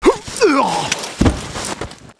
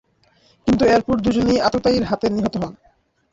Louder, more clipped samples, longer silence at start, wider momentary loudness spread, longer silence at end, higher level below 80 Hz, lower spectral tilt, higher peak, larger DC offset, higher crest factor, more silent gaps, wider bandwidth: about the same, -17 LUFS vs -19 LUFS; neither; second, 0 s vs 0.65 s; about the same, 10 LU vs 10 LU; second, 0.05 s vs 0.6 s; first, -30 dBFS vs -42 dBFS; second, -4.5 dB/octave vs -6 dB/octave; first, 0 dBFS vs -4 dBFS; neither; about the same, 18 dB vs 14 dB; neither; first, 11 kHz vs 7.8 kHz